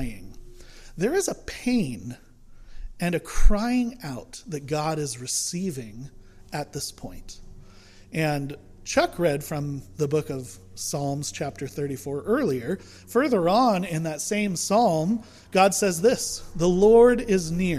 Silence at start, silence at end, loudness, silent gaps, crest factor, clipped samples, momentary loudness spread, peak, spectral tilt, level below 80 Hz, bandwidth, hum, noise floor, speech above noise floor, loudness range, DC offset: 0 s; 0 s; -25 LUFS; none; 22 dB; under 0.1%; 17 LU; -2 dBFS; -5 dB/octave; -34 dBFS; 15.5 kHz; none; -48 dBFS; 25 dB; 9 LU; under 0.1%